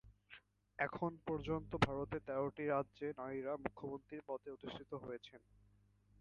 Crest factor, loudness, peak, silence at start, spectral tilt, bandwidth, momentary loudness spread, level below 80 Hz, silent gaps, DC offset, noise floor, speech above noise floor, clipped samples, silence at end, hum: 26 dB; -43 LUFS; -18 dBFS; 0.05 s; -7 dB/octave; 11 kHz; 19 LU; -64 dBFS; none; under 0.1%; -72 dBFS; 29 dB; under 0.1%; 0.85 s; none